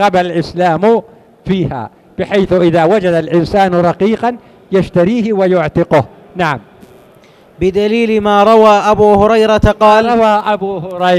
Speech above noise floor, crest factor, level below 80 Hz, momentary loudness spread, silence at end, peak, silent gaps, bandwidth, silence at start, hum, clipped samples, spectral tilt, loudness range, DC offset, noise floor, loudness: 32 dB; 12 dB; -34 dBFS; 10 LU; 0 s; 0 dBFS; none; 13 kHz; 0 s; none; 0.5%; -7 dB/octave; 5 LU; under 0.1%; -43 dBFS; -11 LUFS